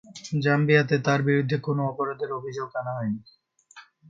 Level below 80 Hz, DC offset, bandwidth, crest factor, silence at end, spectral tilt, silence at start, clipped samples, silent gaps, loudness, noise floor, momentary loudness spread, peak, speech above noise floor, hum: -68 dBFS; under 0.1%; 7.6 kHz; 20 dB; 0.3 s; -7 dB/octave; 0.1 s; under 0.1%; none; -25 LUFS; -52 dBFS; 11 LU; -6 dBFS; 28 dB; none